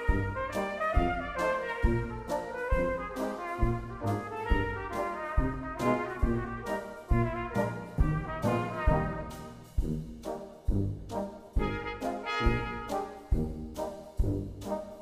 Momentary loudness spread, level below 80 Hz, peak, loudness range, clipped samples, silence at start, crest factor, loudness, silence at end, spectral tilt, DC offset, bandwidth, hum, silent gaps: 8 LU; -36 dBFS; -12 dBFS; 2 LU; under 0.1%; 0 s; 18 dB; -33 LUFS; 0 s; -7 dB/octave; under 0.1%; 15 kHz; none; none